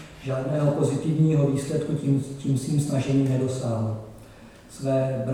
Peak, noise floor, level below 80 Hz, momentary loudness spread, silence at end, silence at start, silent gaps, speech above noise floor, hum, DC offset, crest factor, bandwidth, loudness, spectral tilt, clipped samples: -10 dBFS; -46 dBFS; -54 dBFS; 9 LU; 0 s; 0 s; none; 23 dB; none; under 0.1%; 14 dB; 13.5 kHz; -25 LUFS; -7.5 dB/octave; under 0.1%